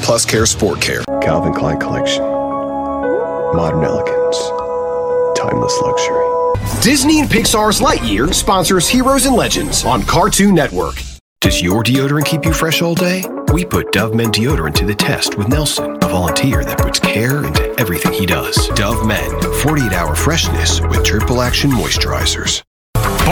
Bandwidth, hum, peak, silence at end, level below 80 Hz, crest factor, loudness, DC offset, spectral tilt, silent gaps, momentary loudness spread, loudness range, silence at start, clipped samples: 18 kHz; none; 0 dBFS; 0 s; -26 dBFS; 14 dB; -14 LUFS; under 0.1%; -4 dB/octave; 11.21-11.36 s, 22.67-22.93 s; 6 LU; 4 LU; 0 s; under 0.1%